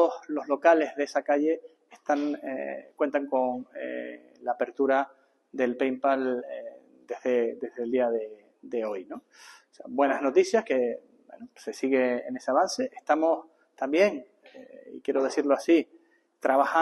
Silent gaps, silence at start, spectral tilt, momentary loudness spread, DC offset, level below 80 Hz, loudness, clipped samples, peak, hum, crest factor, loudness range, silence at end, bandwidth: none; 0 s; -4 dB/octave; 17 LU; under 0.1%; -80 dBFS; -27 LUFS; under 0.1%; -8 dBFS; none; 20 dB; 3 LU; 0 s; 12 kHz